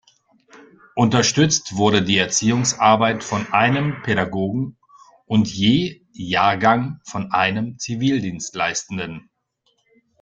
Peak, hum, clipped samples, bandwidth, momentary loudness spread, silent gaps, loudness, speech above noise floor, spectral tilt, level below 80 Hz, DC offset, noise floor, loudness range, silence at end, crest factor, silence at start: -2 dBFS; none; under 0.1%; 9.4 kHz; 12 LU; none; -19 LUFS; 48 dB; -4 dB/octave; -54 dBFS; under 0.1%; -67 dBFS; 4 LU; 1.05 s; 18 dB; 0.55 s